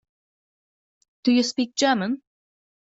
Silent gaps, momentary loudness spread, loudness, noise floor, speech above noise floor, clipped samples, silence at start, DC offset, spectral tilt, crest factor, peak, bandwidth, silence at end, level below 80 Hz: none; 8 LU; -23 LUFS; under -90 dBFS; over 68 dB; under 0.1%; 1.25 s; under 0.1%; -3.5 dB/octave; 20 dB; -6 dBFS; 8 kHz; 0.7 s; -72 dBFS